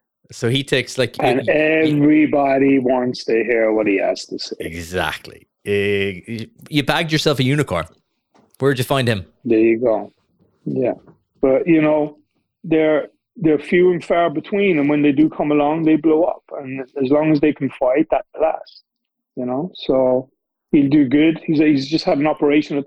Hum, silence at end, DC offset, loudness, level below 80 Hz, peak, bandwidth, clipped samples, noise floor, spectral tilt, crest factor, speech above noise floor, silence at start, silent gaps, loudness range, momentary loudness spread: none; 0 s; under 0.1%; -17 LUFS; -50 dBFS; 0 dBFS; 14 kHz; under 0.1%; -58 dBFS; -6.5 dB/octave; 18 dB; 41 dB; 0.3 s; none; 4 LU; 12 LU